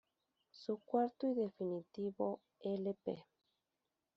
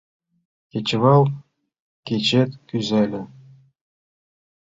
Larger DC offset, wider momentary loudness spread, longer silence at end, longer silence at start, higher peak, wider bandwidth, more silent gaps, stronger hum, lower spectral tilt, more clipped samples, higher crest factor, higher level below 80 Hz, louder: neither; second, 9 LU vs 19 LU; second, 0.95 s vs 1.5 s; second, 0.55 s vs 0.75 s; second, -22 dBFS vs -2 dBFS; about the same, 7.2 kHz vs 7.8 kHz; second, none vs 1.80-2.03 s; neither; about the same, -7.5 dB/octave vs -6.5 dB/octave; neither; about the same, 20 dB vs 20 dB; second, -86 dBFS vs -60 dBFS; second, -41 LUFS vs -20 LUFS